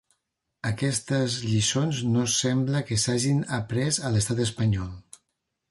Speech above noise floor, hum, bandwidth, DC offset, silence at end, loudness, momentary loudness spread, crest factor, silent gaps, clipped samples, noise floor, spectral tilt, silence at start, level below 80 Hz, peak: 55 dB; none; 11.5 kHz; under 0.1%; 0.7 s; -25 LUFS; 6 LU; 14 dB; none; under 0.1%; -79 dBFS; -4.5 dB/octave; 0.65 s; -50 dBFS; -12 dBFS